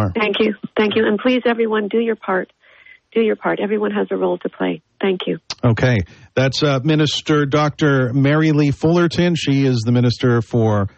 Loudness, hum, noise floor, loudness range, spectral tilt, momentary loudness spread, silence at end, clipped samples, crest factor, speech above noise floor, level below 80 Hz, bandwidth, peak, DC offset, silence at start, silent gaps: -17 LUFS; none; -47 dBFS; 5 LU; -6.5 dB/octave; 6 LU; 0.1 s; under 0.1%; 12 dB; 30 dB; -48 dBFS; 8.4 kHz; -4 dBFS; under 0.1%; 0 s; none